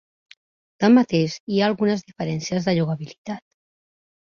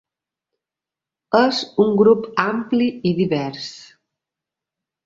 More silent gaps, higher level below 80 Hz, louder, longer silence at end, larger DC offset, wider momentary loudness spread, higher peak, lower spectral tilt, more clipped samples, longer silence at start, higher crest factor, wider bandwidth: first, 1.40-1.47 s, 3.18-3.24 s vs none; about the same, -62 dBFS vs -62 dBFS; second, -21 LUFS vs -18 LUFS; second, 0.9 s vs 1.25 s; neither; first, 17 LU vs 10 LU; about the same, -4 dBFS vs -2 dBFS; about the same, -6.5 dB/octave vs -6.5 dB/octave; neither; second, 0.8 s vs 1.3 s; about the same, 18 dB vs 20 dB; about the same, 7.2 kHz vs 7.6 kHz